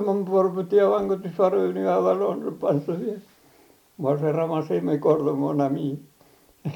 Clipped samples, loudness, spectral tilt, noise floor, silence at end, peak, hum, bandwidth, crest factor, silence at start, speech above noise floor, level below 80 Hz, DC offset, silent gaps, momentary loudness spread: under 0.1%; -23 LUFS; -9 dB/octave; -57 dBFS; 0 s; -6 dBFS; none; 19 kHz; 18 dB; 0 s; 34 dB; -66 dBFS; under 0.1%; none; 9 LU